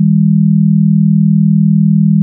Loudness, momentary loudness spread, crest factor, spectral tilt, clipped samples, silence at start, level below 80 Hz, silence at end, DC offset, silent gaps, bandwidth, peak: -9 LUFS; 0 LU; 6 dB; -19.5 dB/octave; under 0.1%; 0 s; -76 dBFS; 0 s; under 0.1%; none; 0.3 kHz; -2 dBFS